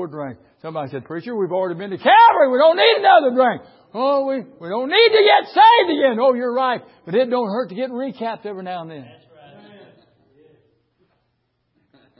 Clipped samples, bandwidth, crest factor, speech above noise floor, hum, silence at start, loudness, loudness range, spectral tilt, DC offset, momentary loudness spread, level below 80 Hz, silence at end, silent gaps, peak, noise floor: under 0.1%; 5.8 kHz; 16 dB; 53 dB; none; 0 s; -16 LUFS; 15 LU; -9 dB/octave; under 0.1%; 18 LU; -70 dBFS; 3.15 s; none; -2 dBFS; -70 dBFS